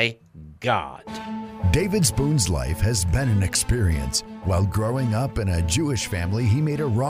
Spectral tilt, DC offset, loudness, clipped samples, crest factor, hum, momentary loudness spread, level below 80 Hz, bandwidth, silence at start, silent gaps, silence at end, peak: -5 dB/octave; under 0.1%; -23 LUFS; under 0.1%; 16 dB; none; 7 LU; -34 dBFS; 16 kHz; 0 s; none; 0 s; -6 dBFS